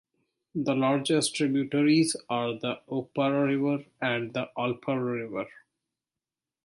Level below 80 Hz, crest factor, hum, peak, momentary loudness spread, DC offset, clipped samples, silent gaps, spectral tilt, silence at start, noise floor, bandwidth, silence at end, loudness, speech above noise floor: -74 dBFS; 16 dB; none; -12 dBFS; 9 LU; under 0.1%; under 0.1%; none; -5 dB/octave; 0.55 s; under -90 dBFS; 11.5 kHz; 1.15 s; -28 LUFS; over 63 dB